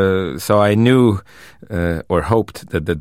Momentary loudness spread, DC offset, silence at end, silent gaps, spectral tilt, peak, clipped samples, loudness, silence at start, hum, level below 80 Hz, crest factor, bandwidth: 11 LU; 0.4%; 0 s; none; -7 dB/octave; -2 dBFS; under 0.1%; -17 LUFS; 0 s; none; -38 dBFS; 16 dB; 16 kHz